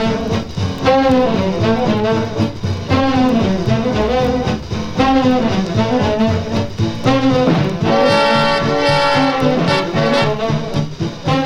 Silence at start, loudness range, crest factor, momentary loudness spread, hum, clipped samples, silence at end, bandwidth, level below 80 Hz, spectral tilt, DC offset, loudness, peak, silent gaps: 0 s; 2 LU; 14 dB; 7 LU; none; under 0.1%; 0 s; 11.5 kHz; -34 dBFS; -6.5 dB/octave; under 0.1%; -15 LUFS; 0 dBFS; none